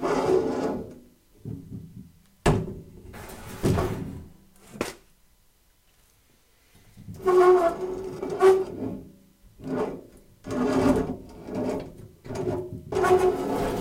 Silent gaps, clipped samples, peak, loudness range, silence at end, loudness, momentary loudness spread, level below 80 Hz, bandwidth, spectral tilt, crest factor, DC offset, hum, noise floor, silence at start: none; under 0.1%; -8 dBFS; 9 LU; 0 s; -25 LUFS; 23 LU; -46 dBFS; 16 kHz; -6.5 dB/octave; 20 dB; under 0.1%; none; -62 dBFS; 0 s